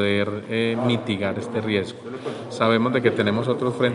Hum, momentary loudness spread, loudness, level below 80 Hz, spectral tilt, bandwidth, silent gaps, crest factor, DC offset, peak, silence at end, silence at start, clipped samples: none; 12 LU; -23 LUFS; -64 dBFS; -6.5 dB/octave; 11 kHz; none; 18 dB; under 0.1%; -4 dBFS; 0 s; 0 s; under 0.1%